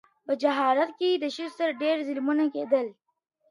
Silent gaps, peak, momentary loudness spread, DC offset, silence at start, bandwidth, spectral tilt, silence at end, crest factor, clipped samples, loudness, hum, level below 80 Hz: none; -10 dBFS; 6 LU; under 0.1%; 0.3 s; 11.5 kHz; -4 dB/octave; 0.6 s; 16 dB; under 0.1%; -27 LUFS; none; -84 dBFS